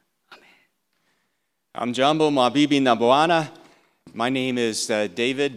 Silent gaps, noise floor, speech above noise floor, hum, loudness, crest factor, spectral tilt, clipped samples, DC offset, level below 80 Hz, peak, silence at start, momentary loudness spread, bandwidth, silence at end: none; -75 dBFS; 55 dB; none; -21 LUFS; 20 dB; -4 dB/octave; under 0.1%; under 0.1%; -76 dBFS; -2 dBFS; 0.3 s; 12 LU; 13.5 kHz; 0 s